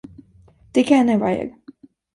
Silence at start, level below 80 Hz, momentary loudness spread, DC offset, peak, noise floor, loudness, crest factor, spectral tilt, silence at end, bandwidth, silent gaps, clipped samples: 0.75 s; -56 dBFS; 11 LU; under 0.1%; -2 dBFS; -52 dBFS; -18 LUFS; 18 dB; -6 dB/octave; 0.65 s; 11.5 kHz; none; under 0.1%